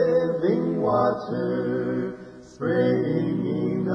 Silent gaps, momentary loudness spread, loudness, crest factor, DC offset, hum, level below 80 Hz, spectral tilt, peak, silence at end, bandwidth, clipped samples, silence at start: none; 8 LU; -24 LUFS; 14 dB; under 0.1%; none; -60 dBFS; -9 dB/octave; -10 dBFS; 0 s; 7 kHz; under 0.1%; 0 s